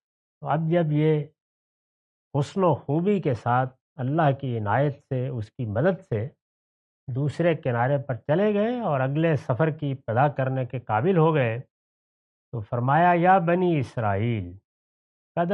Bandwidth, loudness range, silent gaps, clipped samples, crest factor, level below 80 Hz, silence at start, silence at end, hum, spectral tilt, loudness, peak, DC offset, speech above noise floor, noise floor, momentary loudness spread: 8.4 kHz; 4 LU; 1.41-2.31 s, 3.81-3.96 s, 6.42-7.07 s, 11.70-12.52 s, 14.64-15.35 s; under 0.1%; 18 dB; -66 dBFS; 0.4 s; 0 s; none; -9 dB/octave; -24 LUFS; -8 dBFS; under 0.1%; over 67 dB; under -90 dBFS; 11 LU